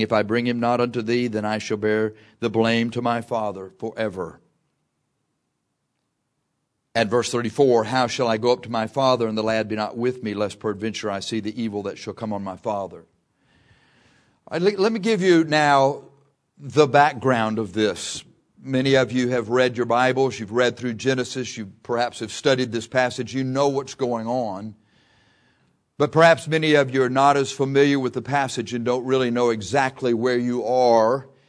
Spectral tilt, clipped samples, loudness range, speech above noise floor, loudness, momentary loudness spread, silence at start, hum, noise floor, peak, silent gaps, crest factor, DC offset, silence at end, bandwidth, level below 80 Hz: -5 dB/octave; under 0.1%; 9 LU; 54 dB; -22 LUFS; 12 LU; 0 s; none; -75 dBFS; 0 dBFS; none; 22 dB; under 0.1%; 0.25 s; 11 kHz; -64 dBFS